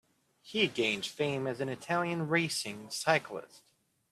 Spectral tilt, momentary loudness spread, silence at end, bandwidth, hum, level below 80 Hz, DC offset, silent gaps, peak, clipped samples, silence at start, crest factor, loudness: -4 dB/octave; 8 LU; 0.55 s; 14.5 kHz; none; -76 dBFS; under 0.1%; none; -10 dBFS; under 0.1%; 0.45 s; 24 dB; -32 LUFS